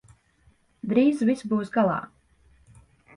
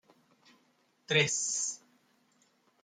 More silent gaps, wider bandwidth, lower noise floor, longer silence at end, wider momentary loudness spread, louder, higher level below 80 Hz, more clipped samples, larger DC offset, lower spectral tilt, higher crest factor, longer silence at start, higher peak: neither; second, 11 kHz vs 13 kHz; second, -62 dBFS vs -71 dBFS; about the same, 1.1 s vs 1.05 s; first, 14 LU vs 10 LU; first, -24 LUFS vs -30 LUFS; first, -62 dBFS vs -80 dBFS; neither; neither; first, -7.5 dB/octave vs -2 dB/octave; second, 18 dB vs 24 dB; second, 0.85 s vs 1.1 s; first, -8 dBFS vs -14 dBFS